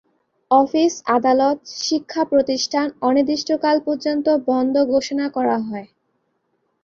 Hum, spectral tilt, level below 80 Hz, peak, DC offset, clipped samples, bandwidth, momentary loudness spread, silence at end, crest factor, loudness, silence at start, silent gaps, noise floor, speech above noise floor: none; -3.5 dB/octave; -62 dBFS; -2 dBFS; under 0.1%; under 0.1%; 7.6 kHz; 6 LU; 1 s; 18 dB; -19 LUFS; 0.5 s; none; -69 dBFS; 51 dB